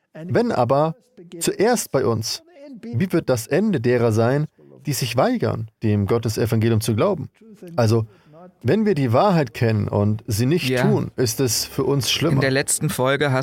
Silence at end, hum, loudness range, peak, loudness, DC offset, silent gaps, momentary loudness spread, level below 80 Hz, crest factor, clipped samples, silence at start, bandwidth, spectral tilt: 0 s; none; 2 LU; -6 dBFS; -20 LUFS; under 0.1%; none; 8 LU; -54 dBFS; 14 dB; under 0.1%; 0.15 s; 17 kHz; -5.5 dB/octave